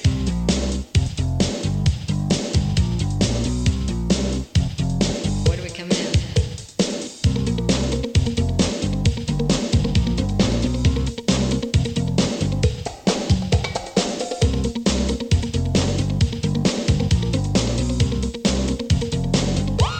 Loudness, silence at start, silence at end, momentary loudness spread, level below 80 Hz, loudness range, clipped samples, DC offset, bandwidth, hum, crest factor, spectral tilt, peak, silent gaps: -21 LUFS; 0 s; 0 s; 3 LU; -28 dBFS; 1 LU; under 0.1%; under 0.1%; 10 kHz; none; 16 dB; -5.5 dB/octave; -4 dBFS; none